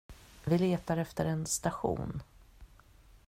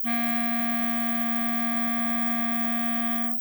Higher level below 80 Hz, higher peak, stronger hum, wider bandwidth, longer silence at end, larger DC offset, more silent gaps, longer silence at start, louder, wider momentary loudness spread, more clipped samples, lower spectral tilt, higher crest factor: first, -54 dBFS vs -74 dBFS; second, -16 dBFS vs -12 dBFS; neither; second, 16 kHz vs over 20 kHz; first, 0.6 s vs 0 s; second, under 0.1% vs 0.2%; neither; about the same, 0.1 s vs 0 s; second, -33 LUFS vs -24 LUFS; first, 12 LU vs 0 LU; neither; about the same, -5.5 dB/octave vs -5 dB/octave; about the same, 18 dB vs 14 dB